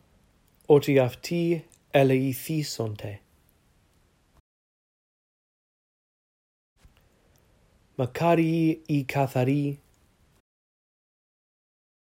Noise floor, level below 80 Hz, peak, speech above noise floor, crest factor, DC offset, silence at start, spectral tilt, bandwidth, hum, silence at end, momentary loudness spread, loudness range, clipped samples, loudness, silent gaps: -65 dBFS; -64 dBFS; -6 dBFS; 41 dB; 22 dB; under 0.1%; 0.7 s; -7 dB/octave; 16 kHz; none; 2.25 s; 12 LU; 12 LU; under 0.1%; -25 LUFS; 4.40-6.76 s